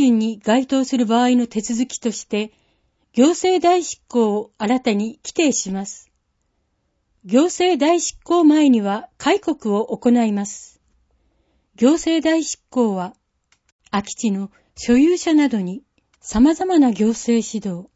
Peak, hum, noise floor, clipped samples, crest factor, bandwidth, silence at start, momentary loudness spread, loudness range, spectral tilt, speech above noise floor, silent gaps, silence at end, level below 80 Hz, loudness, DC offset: -2 dBFS; none; -69 dBFS; under 0.1%; 16 dB; 8 kHz; 0 s; 11 LU; 4 LU; -4.5 dB/octave; 51 dB; 13.72-13.79 s; 0.1 s; -50 dBFS; -18 LUFS; under 0.1%